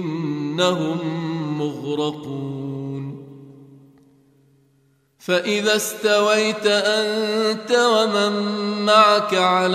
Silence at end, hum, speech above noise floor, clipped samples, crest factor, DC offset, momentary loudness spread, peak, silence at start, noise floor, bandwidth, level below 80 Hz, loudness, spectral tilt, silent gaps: 0 s; none; 42 dB; under 0.1%; 20 dB; under 0.1%; 13 LU; 0 dBFS; 0 s; -61 dBFS; 15.5 kHz; -70 dBFS; -19 LUFS; -4 dB/octave; none